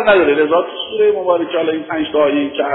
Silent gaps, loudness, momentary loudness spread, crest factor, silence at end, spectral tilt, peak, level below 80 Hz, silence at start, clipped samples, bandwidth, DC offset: none; -15 LUFS; 7 LU; 14 dB; 0 s; -8.5 dB/octave; 0 dBFS; -52 dBFS; 0 s; under 0.1%; 4.1 kHz; under 0.1%